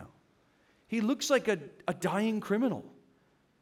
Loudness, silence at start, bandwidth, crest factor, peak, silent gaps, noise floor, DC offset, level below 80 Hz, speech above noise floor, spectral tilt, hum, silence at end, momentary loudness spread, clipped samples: -31 LUFS; 0 s; 16.5 kHz; 20 dB; -12 dBFS; none; -68 dBFS; under 0.1%; -74 dBFS; 38 dB; -4.5 dB/octave; none; 0.7 s; 8 LU; under 0.1%